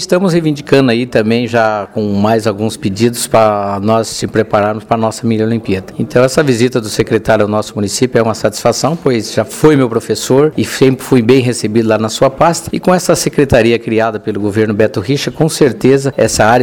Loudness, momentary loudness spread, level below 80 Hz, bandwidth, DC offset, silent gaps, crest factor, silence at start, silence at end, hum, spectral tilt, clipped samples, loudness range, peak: -12 LUFS; 5 LU; -40 dBFS; 19.5 kHz; 0.1%; none; 12 dB; 0 s; 0 s; none; -5.5 dB/octave; 0.3%; 2 LU; 0 dBFS